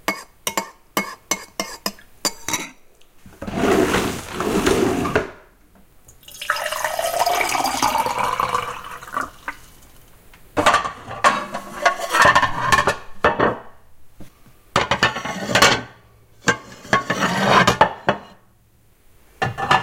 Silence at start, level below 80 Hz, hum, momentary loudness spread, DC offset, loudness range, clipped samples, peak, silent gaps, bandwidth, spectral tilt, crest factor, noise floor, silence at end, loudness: 0.1 s; -44 dBFS; none; 15 LU; under 0.1%; 5 LU; under 0.1%; 0 dBFS; none; 17 kHz; -3 dB/octave; 22 dB; -55 dBFS; 0 s; -20 LUFS